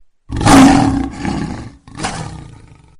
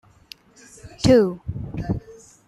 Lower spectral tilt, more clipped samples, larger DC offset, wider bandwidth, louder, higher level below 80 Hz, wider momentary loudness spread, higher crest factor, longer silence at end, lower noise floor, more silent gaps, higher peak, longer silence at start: second, -5 dB/octave vs -6.5 dB/octave; first, 0.1% vs under 0.1%; neither; first, 14.5 kHz vs 13 kHz; first, -12 LUFS vs -21 LUFS; first, -28 dBFS vs -42 dBFS; first, 23 LU vs 15 LU; second, 14 dB vs 20 dB; first, 0.55 s vs 0.35 s; second, -40 dBFS vs -49 dBFS; neither; first, 0 dBFS vs -4 dBFS; second, 0.3 s vs 0.85 s